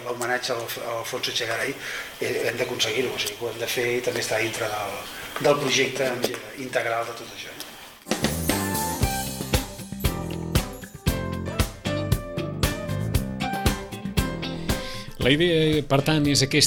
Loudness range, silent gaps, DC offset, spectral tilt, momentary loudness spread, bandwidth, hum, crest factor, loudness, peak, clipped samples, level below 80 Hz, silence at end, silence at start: 3 LU; none; under 0.1%; -4 dB/octave; 11 LU; 19 kHz; none; 22 dB; -25 LUFS; -4 dBFS; under 0.1%; -38 dBFS; 0 s; 0 s